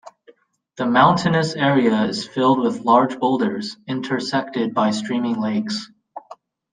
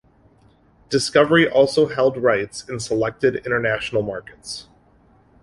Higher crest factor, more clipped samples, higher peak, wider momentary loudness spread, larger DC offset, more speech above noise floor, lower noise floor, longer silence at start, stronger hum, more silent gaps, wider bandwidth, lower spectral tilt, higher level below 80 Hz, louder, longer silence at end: about the same, 18 dB vs 18 dB; neither; about the same, -2 dBFS vs -2 dBFS; second, 12 LU vs 17 LU; neither; about the same, 34 dB vs 36 dB; about the same, -53 dBFS vs -55 dBFS; second, 0.05 s vs 0.9 s; neither; neither; second, 9.6 kHz vs 11.5 kHz; first, -6 dB/octave vs -4.5 dB/octave; second, -60 dBFS vs -54 dBFS; about the same, -19 LUFS vs -19 LUFS; second, 0.4 s vs 0.8 s